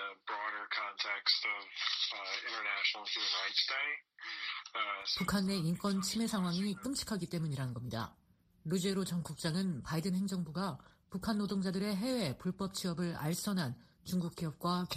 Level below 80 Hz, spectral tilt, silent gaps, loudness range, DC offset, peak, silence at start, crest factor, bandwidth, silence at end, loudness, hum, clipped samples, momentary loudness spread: -64 dBFS; -4.5 dB/octave; none; 4 LU; under 0.1%; -18 dBFS; 0 s; 20 dB; 15.5 kHz; 0 s; -36 LUFS; none; under 0.1%; 8 LU